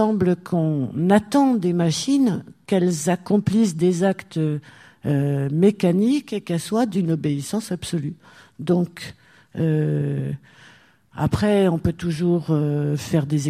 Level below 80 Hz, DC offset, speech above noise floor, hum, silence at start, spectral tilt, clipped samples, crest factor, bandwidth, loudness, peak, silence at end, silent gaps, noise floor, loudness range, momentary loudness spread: -52 dBFS; under 0.1%; 32 dB; none; 0 s; -7 dB/octave; under 0.1%; 16 dB; 15 kHz; -21 LUFS; -4 dBFS; 0 s; none; -52 dBFS; 5 LU; 10 LU